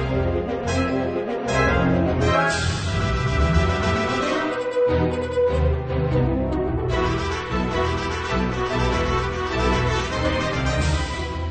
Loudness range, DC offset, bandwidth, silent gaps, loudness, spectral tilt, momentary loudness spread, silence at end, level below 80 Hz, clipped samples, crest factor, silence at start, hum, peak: 2 LU; under 0.1%; 9.2 kHz; none; -22 LUFS; -6 dB/octave; 5 LU; 0 s; -30 dBFS; under 0.1%; 16 dB; 0 s; none; -6 dBFS